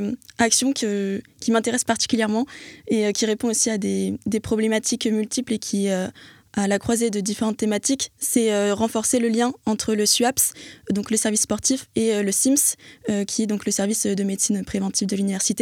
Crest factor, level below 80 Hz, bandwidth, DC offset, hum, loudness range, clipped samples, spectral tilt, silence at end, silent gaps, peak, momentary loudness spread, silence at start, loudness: 18 dB; -56 dBFS; 17 kHz; under 0.1%; none; 3 LU; under 0.1%; -3.5 dB/octave; 0 s; none; -4 dBFS; 8 LU; 0 s; -22 LUFS